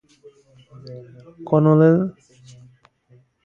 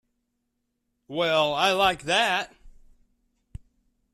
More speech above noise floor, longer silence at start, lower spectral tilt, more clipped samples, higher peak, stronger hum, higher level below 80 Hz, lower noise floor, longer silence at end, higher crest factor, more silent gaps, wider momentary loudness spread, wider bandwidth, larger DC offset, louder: second, 38 dB vs 54 dB; second, 0.85 s vs 1.1 s; first, -10.5 dB/octave vs -3 dB/octave; neither; first, -4 dBFS vs -8 dBFS; neither; second, -62 dBFS vs -56 dBFS; second, -56 dBFS vs -78 dBFS; about the same, 1.35 s vs 1.45 s; about the same, 18 dB vs 20 dB; neither; first, 26 LU vs 10 LU; second, 7 kHz vs 14 kHz; neither; first, -17 LUFS vs -23 LUFS